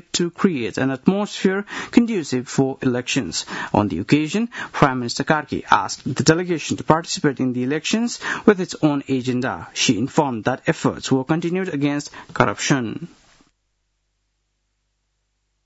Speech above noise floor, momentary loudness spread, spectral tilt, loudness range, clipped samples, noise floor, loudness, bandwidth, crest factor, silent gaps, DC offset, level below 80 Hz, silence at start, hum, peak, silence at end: 51 dB; 6 LU; -5 dB/octave; 4 LU; under 0.1%; -71 dBFS; -21 LUFS; 8 kHz; 22 dB; none; under 0.1%; -54 dBFS; 0.15 s; 50 Hz at -50 dBFS; 0 dBFS; 2.6 s